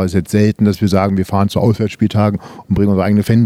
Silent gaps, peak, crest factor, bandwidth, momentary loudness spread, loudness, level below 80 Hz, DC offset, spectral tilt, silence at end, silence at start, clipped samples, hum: none; 0 dBFS; 14 dB; 15.5 kHz; 3 LU; -14 LUFS; -40 dBFS; under 0.1%; -7.5 dB/octave; 0 s; 0 s; under 0.1%; none